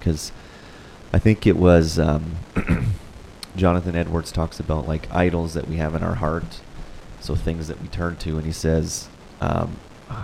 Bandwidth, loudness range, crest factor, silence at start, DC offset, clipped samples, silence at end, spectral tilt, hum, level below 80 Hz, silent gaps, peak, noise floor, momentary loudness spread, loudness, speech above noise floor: 14.5 kHz; 6 LU; 22 dB; 0 s; under 0.1%; under 0.1%; 0 s; -6.5 dB/octave; none; -32 dBFS; none; -2 dBFS; -42 dBFS; 23 LU; -22 LUFS; 21 dB